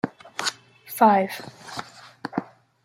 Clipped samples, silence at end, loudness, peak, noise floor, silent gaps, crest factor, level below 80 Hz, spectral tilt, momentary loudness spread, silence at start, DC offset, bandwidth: under 0.1%; 0.4 s; -23 LUFS; -4 dBFS; -41 dBFS; none; 22 dB; -74 dBFS; -4 dB/octave; 19 LU; 0.05 s; under 0.1%; 16.5 kHz